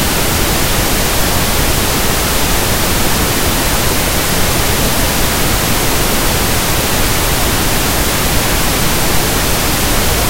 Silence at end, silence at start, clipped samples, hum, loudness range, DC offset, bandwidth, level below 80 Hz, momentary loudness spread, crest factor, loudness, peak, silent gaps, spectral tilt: 0 s; 0 s; under 0.1%; none; 0 LU; under 0.1%; 16.5 kHz; -20 dBFS; 0 LU; 12 dB; -12 LUFS; 0 dBFS; none; -3 dB/octave